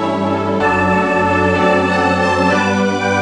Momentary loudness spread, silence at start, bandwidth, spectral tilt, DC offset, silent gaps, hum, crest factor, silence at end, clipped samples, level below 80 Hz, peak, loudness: 3 LU; 0 s; 10.5 kHz; -6 dB/octave; under 0.1%; none; none; 14 dB; 0 s; under 0.1%; -48 dBFS; 0 dBFS; -14 LUFS